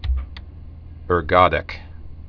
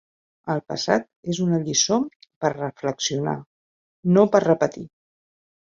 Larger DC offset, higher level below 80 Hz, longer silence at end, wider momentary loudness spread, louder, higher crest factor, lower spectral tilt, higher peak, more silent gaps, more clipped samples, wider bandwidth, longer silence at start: neither; first, -30 dBFS vs -64 dBFS; second, 0 s vs 0.9 s; first, 25 LU vs 13 LU; first, -19 LUFS vs -22 LUFS; about the same, 22 dB vs 20 dB; first, -8 dB/octave vs -4.5 dB/octave; about the same, 0 dBFS vs -2 dBFS; second, none vs 1.16-1.23 s, 2.16-2.20 s, 2.36-2.41 s, 3.46-4.03 s; neither; second, 5.4 kHz vs 7.8 kHz; second, 0 s vs 0.45 s